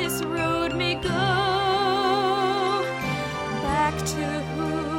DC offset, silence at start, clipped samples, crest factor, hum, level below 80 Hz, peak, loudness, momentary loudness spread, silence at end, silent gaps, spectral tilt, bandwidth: under 0.1%; 0 s; under 0.1%; 14 dB; none; -44 dBFS; -10 dBFS; -24 LUFS; 6 LU; 0 s; none; -4.5 dB/octave; 17 kHz